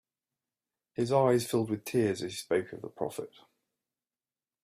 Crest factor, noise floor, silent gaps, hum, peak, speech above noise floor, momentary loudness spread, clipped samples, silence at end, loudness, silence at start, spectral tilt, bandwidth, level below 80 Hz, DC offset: 20 dB; under -90 dBFS; none; none; -12 dBFS; over 60 dB; 17 LU; under 0.1%; 1.35 s; -30 LUFS; 1 s; -5.5 dB/octave; 15.5 kHz; -72 dBFS; under 0.1%